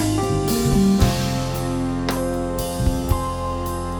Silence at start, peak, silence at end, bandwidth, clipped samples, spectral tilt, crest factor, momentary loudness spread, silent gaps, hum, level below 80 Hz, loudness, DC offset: 0 s; -4 dBFS; 0 s; over 20 kHz; under 0.1%; -6 dB/octave; 18 dB; 8 LU; none; none; -30 dBFS; -21 LUFS; under 0.1%